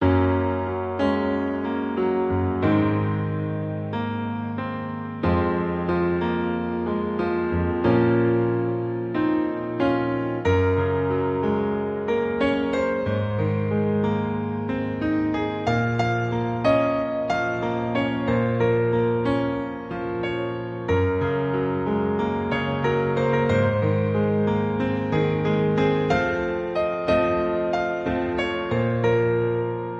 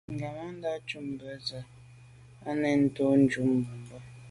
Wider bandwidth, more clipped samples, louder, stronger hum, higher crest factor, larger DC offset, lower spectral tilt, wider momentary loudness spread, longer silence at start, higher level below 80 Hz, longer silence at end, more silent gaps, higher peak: second, 7.8 kHz vs 11.5 kHz; neither; first, -23 LUFS vs -30 LUFS; neither; about the same, 16 dB vs 18 dB; neither; first, -8.5 dB/octave vs -7 dB/octave; second, 6 LU vs 21 LU; about the same, 0 s vs 0.1 s; first, -42 dBFS vs -62 dBFS; about the same, 0 s vs 0 s; neither; first, -6 dBFS vs -12 dBFS